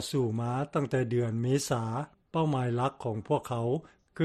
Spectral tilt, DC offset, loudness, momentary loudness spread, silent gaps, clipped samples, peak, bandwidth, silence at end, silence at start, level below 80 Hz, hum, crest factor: -6.5 dB/octave; under 0.1%; -31 LUFS; 6 LU; none; under 0.1%; -14 dBFS; 13 kHz; 0 s; 0 s; -62 dBFS; none; 16 dB